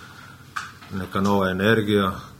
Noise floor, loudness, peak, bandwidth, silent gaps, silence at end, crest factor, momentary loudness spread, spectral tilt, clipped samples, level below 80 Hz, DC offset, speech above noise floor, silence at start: -44 dBFS; -21 LUFS; -4 dBFS; 16 kHz; none; 0.05 s; 20 dB; 15 LU; -6 dB/octave; under 0.1%; -54 dBFS; under 0.1%; 22 dB; 0 s